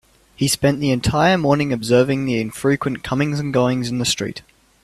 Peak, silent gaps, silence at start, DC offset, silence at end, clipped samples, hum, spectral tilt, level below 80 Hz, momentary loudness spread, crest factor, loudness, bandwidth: -2 dBFS; none; 0.4 s; under 0.1%; 0.45 s; under 0.1%; none; -5 dB/octave; -44 dBFS; 7 LU; 16 dB; -19 LUFS; 14 kHz